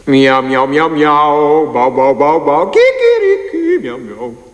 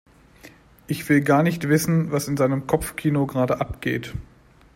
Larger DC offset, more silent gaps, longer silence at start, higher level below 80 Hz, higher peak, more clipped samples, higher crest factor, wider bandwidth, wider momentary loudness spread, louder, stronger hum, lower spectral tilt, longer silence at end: neither; neither; second, 0.05 s vs 0.45 s; about the same, -48 dBFS vs -46 dBFS; first, 0 dBFS vs -4 dBFS; neither; second, 10 dB vs 18 dB; second, 10 kHz vs 16.5 kHz; second, 8 LU vs 11 LU; first, -11 LUFS vs -22 LUFS; neither; about the same, -6 dB/octave vs -6.5 dB/octave; second, 0.15 s vs 0.55 s